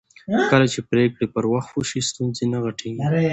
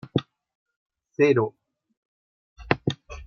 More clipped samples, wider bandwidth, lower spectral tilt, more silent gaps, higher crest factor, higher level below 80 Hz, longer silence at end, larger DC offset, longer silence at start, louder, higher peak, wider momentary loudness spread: neither; first, 8.8 kHz vs 7 kHz; second, -5.5 dB/octave vs -7 dB/octave; second, none vs 0.55-0.66 s, 0.76-0.90 s, 1.97-2.56 s; second, 18 dB vs 24 dB; about the same, -54 dBFS vs -52 dBFS; about the same, 0 s vs 0 s; neither; first, 0.3 s vs 0.15 s; first, -22 LUFS vs -25 LUFS; about the same, -2 dBFS vs -4 dBFS; second, 8 LU vs 11 LU